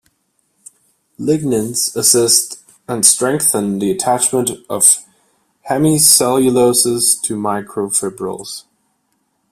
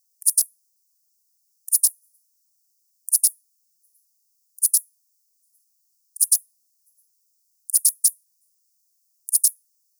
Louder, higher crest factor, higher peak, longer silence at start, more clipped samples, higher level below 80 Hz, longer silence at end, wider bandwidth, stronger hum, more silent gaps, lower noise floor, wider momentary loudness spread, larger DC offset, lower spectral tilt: first, -13 LUFS vs -19 LUFS; second, 16 dB vs 22 dB; first, 0 dBFS vs -4 dBFS; first, 1.2 s vs 0.25 s; neither; first, -56 dBFS vs under -90 dBFS; first, 0.9 s vs 0.5 s; second, 16 kHz vs over 20 kHz; neither; neither; second, -65 dBFS vs -69 dBFS; first, 14 LU vs 10 LU; neither; first, -3 dB/octave vs 12 dB/octave